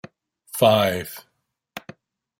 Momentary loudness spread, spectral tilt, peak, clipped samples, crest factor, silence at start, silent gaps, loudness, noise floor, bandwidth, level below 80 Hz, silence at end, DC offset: 23 LU; -4.5 dB/octave; -2 dBFS; under 0.1%; 22 dB; 0.55 s; none; -20 LUFS; -47 dBFS; 16.5 kHz; -64 dBFS; 0.6 s; under 0.1%